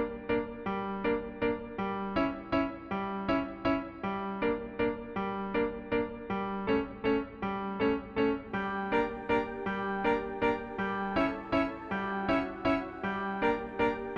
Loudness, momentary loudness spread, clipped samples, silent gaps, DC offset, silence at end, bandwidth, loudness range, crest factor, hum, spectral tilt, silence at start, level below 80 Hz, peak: -32 LUFS; 5 LU; under 0.1%; none; under 0.1%; 0 s; 7 kHz; 2 LU; 16 dB; none; -8 dB/octave; 0 s; -52 dBFS; -16 dBFS